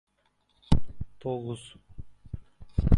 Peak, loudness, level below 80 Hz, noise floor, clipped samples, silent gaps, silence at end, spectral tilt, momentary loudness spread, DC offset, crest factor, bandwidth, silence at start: -4 dBFS; -33 LUFS; -34 dBFS; -71 dBFS; under 0.1%; none; 0 s; -8 dB/octave; 21 LU; under 0.1%; 24 dB; 11 kHz; 0.7 s